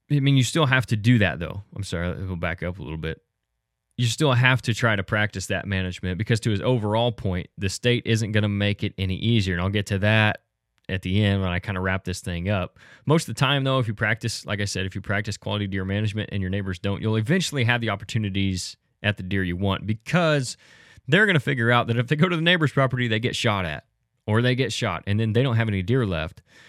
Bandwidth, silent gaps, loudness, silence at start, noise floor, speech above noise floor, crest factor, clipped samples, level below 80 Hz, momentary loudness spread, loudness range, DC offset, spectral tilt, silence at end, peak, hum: 13.5 kHz; none; -23 LUFS; 0.1 s; -79 dBFS; 56 dB; 22 dB; under 0.1%; -50 dBFS; 10 LU; 4 LU; under 0.1%; -5.5 dB/octave; 0.4 s; -2 dBFS; none